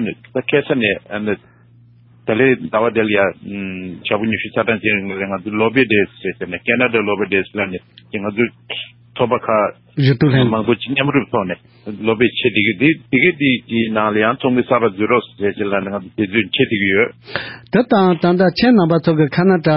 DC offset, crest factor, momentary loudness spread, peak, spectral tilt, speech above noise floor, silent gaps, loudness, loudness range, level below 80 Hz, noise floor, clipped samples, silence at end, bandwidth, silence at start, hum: under 0.1%; 16 dB; 12 LU; 0 dBFS; -11.5 dB/octave; 31 dB; none; -16 LUFS; 3 LU; -50 dBFS; -47 dBFS; under 0.1%; 0 s; 5.8 kHz; 0 s; none